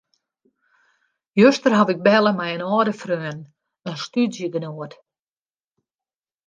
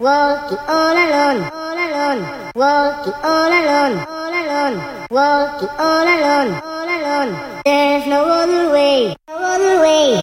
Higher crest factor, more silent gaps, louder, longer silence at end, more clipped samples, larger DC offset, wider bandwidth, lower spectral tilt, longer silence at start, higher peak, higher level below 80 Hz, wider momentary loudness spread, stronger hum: first, 20 dB vs 14 dB; neither; second, -19 LUFS vs -15 LUFS; first, 1.6 s vs 0 s; neither; neither; second, 7.6 kHz vs 16 kHz; first, -6 dB/octave vs -4 dB/octave; first, 1.35 s vs 0 s; about the same, -2 dBFS vs -2 dBFS; second, -70 dBFS vs -52 dBFS; first, 18 LU vs 8 LU; neither